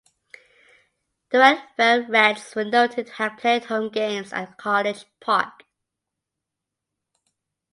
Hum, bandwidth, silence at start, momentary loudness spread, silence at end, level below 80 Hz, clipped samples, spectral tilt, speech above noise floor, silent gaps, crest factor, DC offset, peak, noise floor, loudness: none; 11.5 kHz; 1.3 s; 12 LU; 2.25 s; -76 dBFS; under 0.1%; -3.5 dB/octave; 63 dB; none; 24 dB; under 0.1%; 0 dBFS; -84 dBFS; -21 LUFS